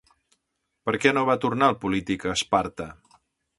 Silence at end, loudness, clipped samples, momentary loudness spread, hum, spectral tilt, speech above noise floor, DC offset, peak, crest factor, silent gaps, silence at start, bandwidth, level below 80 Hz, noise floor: 0.65 s; -24 LUFS; under 0.1%; 12 LU; none; -4.5 dB/octave; 54 dB; under 0.1%; -4 dBFS; 22 dB; none; 0.85 s; 11.5 kHz; -54 dBFS; -78 dBFS